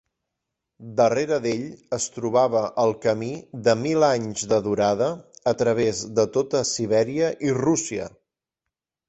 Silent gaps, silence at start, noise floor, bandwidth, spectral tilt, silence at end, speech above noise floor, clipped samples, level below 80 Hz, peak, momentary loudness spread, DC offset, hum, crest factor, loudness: none; 0.8 s; -85 dBFS; 8.2 kHz; -4.5 dB/octave; 1 s; 63 dB; under 0.1%; -60 dBFS; -6 dBFS; 8 LU; under 0.1%; none; 18 dB; -23 LUFS